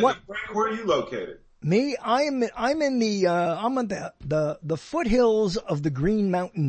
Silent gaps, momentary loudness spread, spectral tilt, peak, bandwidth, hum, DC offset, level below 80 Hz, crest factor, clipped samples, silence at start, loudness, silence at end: none; 9 LU; -6 dB/octave; -8 dBFS; 8.8 kHz; none; under 0.1%; -46 dBFS; 16 dB; under 0.1%; 0 s; -25 LUFS; 0 s